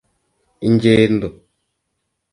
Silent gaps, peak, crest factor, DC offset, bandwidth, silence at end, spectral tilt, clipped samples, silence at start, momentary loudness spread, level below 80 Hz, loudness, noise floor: none; 0 dBFS; 18 dB; under 0.1%; 10.5 kHz; 1 s; -7.5 dB/octave; under 0.1%; 0.6 s; 12 LU; -48 dBFS; -15 LUFS; -74 dBFS